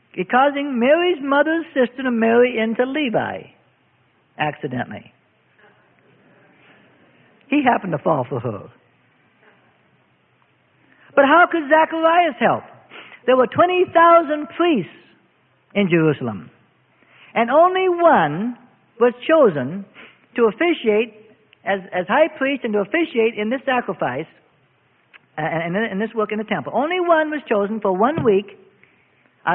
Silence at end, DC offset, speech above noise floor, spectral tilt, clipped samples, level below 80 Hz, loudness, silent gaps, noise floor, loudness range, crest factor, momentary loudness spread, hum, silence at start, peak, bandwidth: 0 s; under 0.1%; 42 dB; -11 dB/octave; under 0.1%; -64 dBFS; -18 LUFS; none; -60 dBFS; 9 LU; 18 dB; 13 LU; none; 0.15 s; -2 dBFS; 3.9 kHz